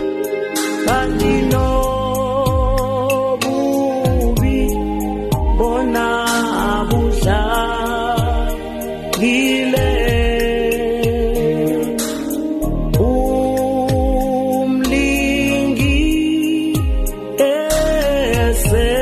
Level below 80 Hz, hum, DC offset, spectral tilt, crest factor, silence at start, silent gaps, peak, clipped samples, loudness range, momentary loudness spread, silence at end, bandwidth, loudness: -22 dBFS; none; under 0.1%; -5.5 dB/octave; 12 dB; 0 s; none; -4 dBFS; under 0.1%; 2 LU; 5 LU; 0 s; 13 kHz; -17 LUFS